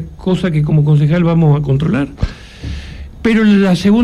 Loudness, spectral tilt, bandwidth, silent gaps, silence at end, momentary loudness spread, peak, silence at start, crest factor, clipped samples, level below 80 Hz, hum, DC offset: -13 LUFS; -8 dB/octave; 10.5 kHz; none; 0 s; 17 LU; -2 dBFS; 0 s; 10 dB; under 0.1%; -30 dBFS; none; under 0.1%